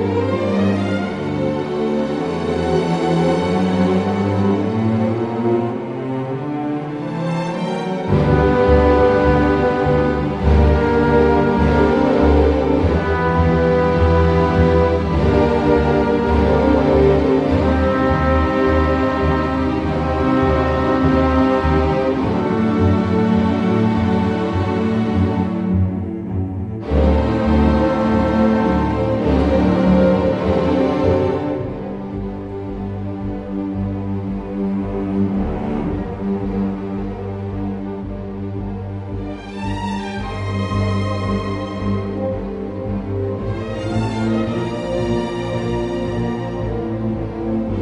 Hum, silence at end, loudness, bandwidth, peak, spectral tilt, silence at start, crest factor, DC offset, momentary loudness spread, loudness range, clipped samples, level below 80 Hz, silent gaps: none; 0 s; -18 LUFS; 9.4 kHz; -2 dBFS; -8.5 dB/octave; 0 s; 16 dB; under 0.1%; 11 LU; 8 LU; under 0.1%; -28 dBFS; none